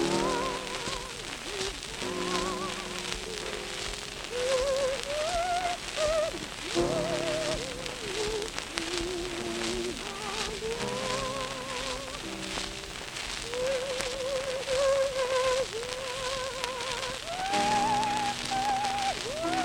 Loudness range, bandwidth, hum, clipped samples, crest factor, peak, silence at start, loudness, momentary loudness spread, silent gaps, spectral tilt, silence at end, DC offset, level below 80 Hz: 4 LU; 19 kHz; none; under 0.1%; 28 dB; -4 dBFS; 0 s; -31 LUFS; 7 LU; none; -2.5 dB/octave; 0 s; under 0.1%; -50 dBFS